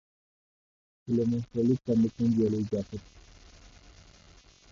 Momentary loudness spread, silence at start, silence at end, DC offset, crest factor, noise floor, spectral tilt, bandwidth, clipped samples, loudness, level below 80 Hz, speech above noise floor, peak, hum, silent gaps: 14 LU; 1.05 s; 1.05 s; under 0.1%; 16 dB; -57 dBFS; -9 dB/octave; 7.4 kHz; under 0.1%; -28 LUFS; -56 dBFS; 29 dB; -14 dBFS; none; none